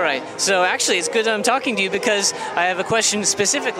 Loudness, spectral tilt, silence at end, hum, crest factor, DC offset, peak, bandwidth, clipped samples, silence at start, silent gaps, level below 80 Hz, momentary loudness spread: -18 LUFS; -1.5 dB/octave; 0 s; none; 18 dB; under 0.1%; -2 dBFS; 16.5 kHz; under 0.1%; 0 s; none; -62 dBFS; 3 LU